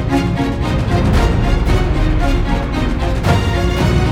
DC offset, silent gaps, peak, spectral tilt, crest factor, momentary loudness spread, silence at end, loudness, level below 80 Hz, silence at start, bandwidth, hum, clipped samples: under 0.1%; none; -2 dBFS; -6.5 dB/octave; 12 dB; 3 LU; 0 s; -16 LUFS; -18 dBFS; 0 s; 15 kHz; none; under 0.1%